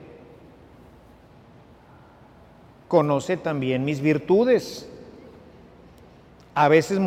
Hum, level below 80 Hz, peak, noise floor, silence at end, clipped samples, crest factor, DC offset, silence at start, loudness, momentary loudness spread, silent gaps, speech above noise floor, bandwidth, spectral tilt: none; -58 dBFS; -4 dBFS; -50 dBFS; 0 s; under 0.1%; 20 dB; under 0.1%; 0 s; -22 LUFS; 21 LU; none; 30 dB; 15.5 kHz; -6.5 dB/octave